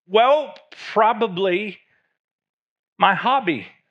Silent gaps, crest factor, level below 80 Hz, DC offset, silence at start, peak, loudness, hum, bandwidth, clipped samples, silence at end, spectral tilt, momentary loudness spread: 2.19-2.39 s, 2.49-2.96 s; 20 dB; -90 dBFS; under 0.1%; 0.1 s; 0 dBFS; -19 LUFS; none; 8 kHz; under 0.1%; 0.2 s; -6 dB/octave; 14 LU